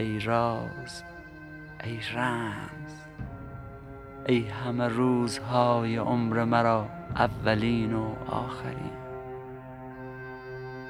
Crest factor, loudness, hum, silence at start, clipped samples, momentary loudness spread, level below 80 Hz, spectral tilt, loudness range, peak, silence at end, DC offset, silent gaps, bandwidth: 22 dB; -28 LUFS; none; 0 s; under 0.1%; 18 LU; -52 dBFS; -6.5 dB/octave; 9 LU; -8 dBFS; 0 s; under 0.1%; none; 12.5 kHz